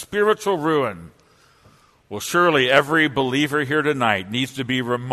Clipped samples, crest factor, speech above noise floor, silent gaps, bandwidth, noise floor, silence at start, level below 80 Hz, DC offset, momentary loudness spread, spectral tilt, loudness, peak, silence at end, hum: under 0.1%; 20 dB; 34 dB; none; 13.5 kHz; -54 dBFS; 0 s; -58 dBFS; under 0.1%; 9 LU; -4.5 dB/octave; -19 LUFS; 0 dBFS; 0 s; none